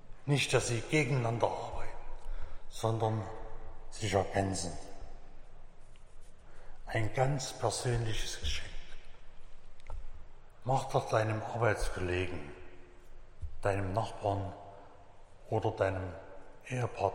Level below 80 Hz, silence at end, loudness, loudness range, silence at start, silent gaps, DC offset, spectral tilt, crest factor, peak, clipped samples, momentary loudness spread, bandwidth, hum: -44 dBFS; 0 s; -34 LUFS; 4 LU; 0.05 s; none; under 0.1%; -5 dB/octave; 22 dB; -12 dBFS; under 0.1%; 20 LU; 16 kHz; none